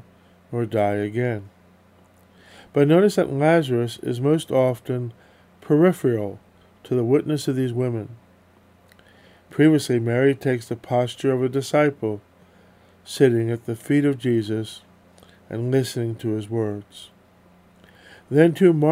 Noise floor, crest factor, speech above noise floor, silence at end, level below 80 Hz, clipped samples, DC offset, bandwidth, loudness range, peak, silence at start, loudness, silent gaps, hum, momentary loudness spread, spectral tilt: -55 dBFS; 20 dB; 34 dB; 0 s; -66 dBFS; under 0.1%; under 0.1%; 16 kHz; 5 LU; -2 dBFS; 0.5 s; -21 LUFS; none; none; 14 LU; -7 dB/octave